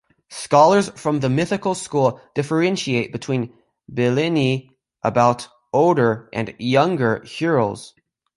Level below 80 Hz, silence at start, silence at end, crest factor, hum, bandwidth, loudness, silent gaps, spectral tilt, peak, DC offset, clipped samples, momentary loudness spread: -58 dBFS; 0.3 s; 0.5 s; 18 dB; none; 11.5 kHz; -20 LUFS; none; -6 dB/octave; -2 dBFS; under 0.1%; under 0.1%; 11 LU